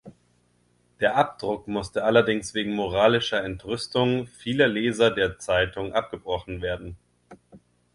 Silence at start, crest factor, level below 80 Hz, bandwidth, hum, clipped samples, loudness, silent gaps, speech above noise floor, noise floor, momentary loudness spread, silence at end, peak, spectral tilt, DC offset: 0.05 s; 22 dB; -50 dBFS; 11.5 kHz; 60 Hz at -50 dBFS; under 0.1%; -24 LUFS; none; 41 dB; -65 dBFS; 10 LU; 0.4 s; -4 dBFS; -5 dB/octave; under 0.1%